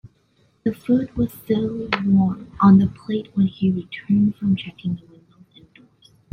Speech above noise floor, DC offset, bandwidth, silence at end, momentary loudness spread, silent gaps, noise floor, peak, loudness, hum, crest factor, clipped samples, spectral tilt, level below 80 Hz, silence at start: 42 dB; under 0.1%; 15 kHz; 1.35 s; 13 LU; none; -61 dBFS; -2 dBFS; -21 LUFS; none; 18 dB; under 0.1%; -9 dB/octave; -50 dBFS; 0.65 s